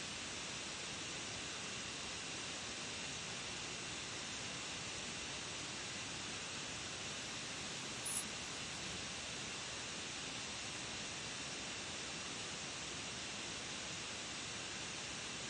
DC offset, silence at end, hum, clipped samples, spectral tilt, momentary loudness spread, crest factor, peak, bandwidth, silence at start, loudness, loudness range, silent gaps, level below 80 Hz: under 0.1%; 0 s; none; under 0.1%; -1.5 dB/octave; 0 LU; 20 dB; -24 dBFS; 11.5 kHz; 0 s; -43 LUFS; 1 LU; none; -68 dBFS